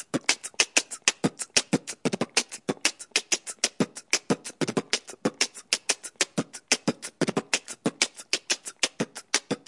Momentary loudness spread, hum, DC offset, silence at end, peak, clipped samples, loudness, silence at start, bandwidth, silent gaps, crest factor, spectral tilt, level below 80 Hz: 6 LU; none; under 0.1%; 0.1 s; -4 dBFS; under 0.1%; -27 LUFS; 0 s; 11.5 kHz; none; 26 dB; -2 dB/octave; -74 dBFS